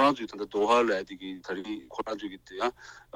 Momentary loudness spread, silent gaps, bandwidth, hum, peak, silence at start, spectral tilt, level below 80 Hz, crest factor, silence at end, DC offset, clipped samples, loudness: 16 LU; none; 15.5 kHz; none; -8 dBFS; 0 s; -4.5 dB/octave; -64 dBFS; 20 dB; 0.15 s; under 0.1%; under 0.1%; -30 LUFS